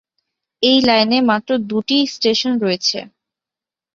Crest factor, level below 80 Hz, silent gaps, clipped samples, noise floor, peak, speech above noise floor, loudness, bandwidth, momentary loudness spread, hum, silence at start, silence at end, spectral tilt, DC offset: 16 dB; -58 dBFS; none; under 0.1%; -88 dBFS; -2 dBFS; 73 dB; -16 LUFS; 7.6 kHz; 7 LU; none; 0.6 s; 0.9 s; -3.5 dB/octave; under 0.1%